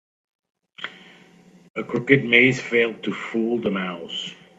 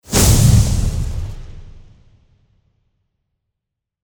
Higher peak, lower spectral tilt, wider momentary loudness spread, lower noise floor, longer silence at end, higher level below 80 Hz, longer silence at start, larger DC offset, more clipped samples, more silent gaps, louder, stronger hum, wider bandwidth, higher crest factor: about the same, 0 dBFS vs 0 dBFS; about the same, -5.5 dB/octave vs -4.5 dB/octave; about the same, 20 LU vs 20 LU; second, -51 dBFS vs -81 dBFS; second, 0.25 s vs 2.2 s; second, -64 dBFS vs -24 dBFS; first, 0.8 s vs 0.1 s; neither; neither; first, 1.70-1.74 s vs none; second, -21 LUFS vs -14 LUFS; neither; second, 8 kHz vs over 20 kHz; first, 24 dB vs 18 dB